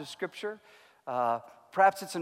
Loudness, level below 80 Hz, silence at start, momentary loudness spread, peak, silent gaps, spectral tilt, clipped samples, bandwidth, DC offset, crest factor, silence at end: -30 LUFS; -84 dBFS; 0 s; 16 LU; -12 dBFS; none; -4 dB/octave; under 0.1%; 16 kHz; under 0.1%; 20 dB; 0 s